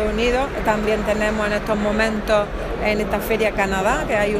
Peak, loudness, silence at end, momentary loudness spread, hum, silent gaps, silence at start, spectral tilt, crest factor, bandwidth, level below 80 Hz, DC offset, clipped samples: -4 dBFS; -20 LUFS; 0 s; 3 LU; none; none; 0 s; -5 dB/octave; 16 dB; 15.5 kHz; -32 dBFS; under 0.1%; under 0.1%